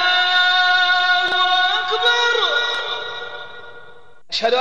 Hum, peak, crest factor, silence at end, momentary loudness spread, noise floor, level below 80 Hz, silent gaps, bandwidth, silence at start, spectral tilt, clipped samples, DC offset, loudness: none; -6 dBFS; 12 dB; 0 s; 15 LU; -46 dBFS; -64 dBFS; none; 9.2 kHz; 0 s; 0 dB/octave; under 0.1%; 1%; -16 LUFS